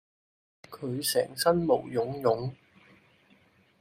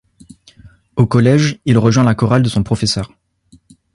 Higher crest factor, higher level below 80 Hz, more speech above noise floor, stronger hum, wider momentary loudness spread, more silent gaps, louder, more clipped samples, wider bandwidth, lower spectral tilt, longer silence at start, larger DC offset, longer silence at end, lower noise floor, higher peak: first, 22 dB vs 16 dB; second, -64 dBFS vs -40 dBFS; about the same, 35 dB vs 38 dB; neither; first, 13 LU vs 9 LU; neither; second, -28 LUFS vs -14 LUFS; neither; first, 15.5 kHz vs 11.5 kHz; second, -4.5 dB/octave vs -6.5 dB/octave; about the same, 0.7 s vs 0.65 s; neither; first, 1.25 s vs 0.9 s; first, -63 dBFS vs -50 dBFS; second, -10 dBFS vs 0 dBFS